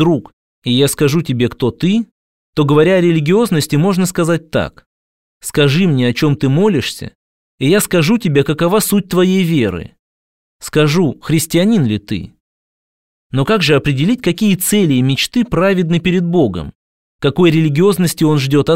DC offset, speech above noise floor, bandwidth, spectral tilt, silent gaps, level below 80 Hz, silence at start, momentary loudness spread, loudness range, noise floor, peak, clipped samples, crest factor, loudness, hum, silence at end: 0.7%; over 77 dB; 16.5 kHz; -5.5 dB/octave; 0.33-0.62 s, 2.11-2.53 s, 4.86-5.41 s, 7.15-7.58 s, 9.99-10.60 s, 12.40-13.30 s, 16.75-17.19 s; -42 dBFS; 0 s; 9 LU; 2 LU; under -90 dBFS; 0 dBFS; under 0.1%; 14 dB; -14 LUFS; none; 0 s